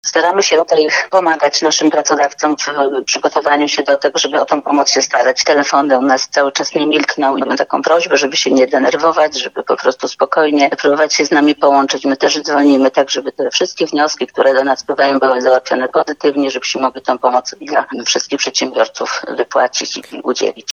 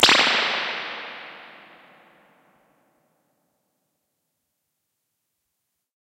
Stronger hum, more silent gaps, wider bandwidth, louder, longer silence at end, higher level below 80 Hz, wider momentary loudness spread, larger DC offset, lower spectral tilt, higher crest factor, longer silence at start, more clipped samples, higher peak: neither; neither; second, 7.4 kHz vs 16 kHz; first, -13 LUFS vs -20 LUFS; second, 0.05 s vs 4.55 s; about the same, -68 dBFS vs -70 dBFS; second, 6 LU vs 26 LU; neither; first, -2 dB/octave vs -0.5 dB/octave; second, 14 dB vs 28 dB; about the same, 0.05 s vs 0 s; neither; about the same, 0 dBFS vs 0 dBFS